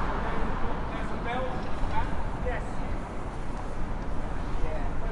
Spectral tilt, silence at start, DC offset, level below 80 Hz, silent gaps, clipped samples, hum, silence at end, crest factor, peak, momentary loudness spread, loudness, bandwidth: -7 dB/octave; 0 s; under 0.1%; -32 dBFS; none; under 0.1%; none; 0 s; 14 dB; -12 dBFS; 5 LU; -34 LUFS; 9.6 kHz